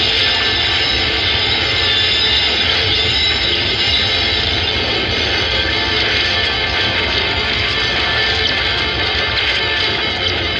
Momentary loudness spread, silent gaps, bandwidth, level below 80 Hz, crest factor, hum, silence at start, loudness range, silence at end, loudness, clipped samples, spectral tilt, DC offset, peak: 3 LU; none; 10.5 kHz; -32 dBFS; 12 dB; none; 0 s; 2 LU; 0 s; -13 LUFS; under 0.1%; -3 dB/octave; under 0.1%; -2 dBFS